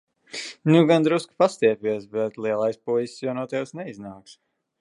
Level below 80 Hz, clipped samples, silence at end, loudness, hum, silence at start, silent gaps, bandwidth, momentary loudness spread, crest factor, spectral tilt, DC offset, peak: -72 dBFS; under 0.1%; 0.5 s; -23 LUFS; none; 0.35 s; none; 11.5 kHz; 17 LU; 20 dB; -6.5 dB/octave; under 0.1%; -4 dBFS